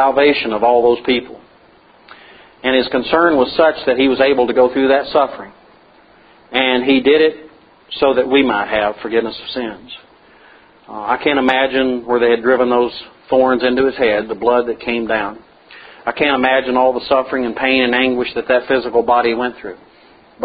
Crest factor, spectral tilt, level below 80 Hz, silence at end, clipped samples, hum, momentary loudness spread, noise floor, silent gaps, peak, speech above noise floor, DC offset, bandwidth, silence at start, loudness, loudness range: 16 dB; -7 dB/octave; -50 dBFS; 0 s; under 0.1%; none; 11 LU; -48 dBFS; none; 0 dBFS; 33 dB; under 0.1%; 5 kHz; 0 s; -15 LUFS; 4 LU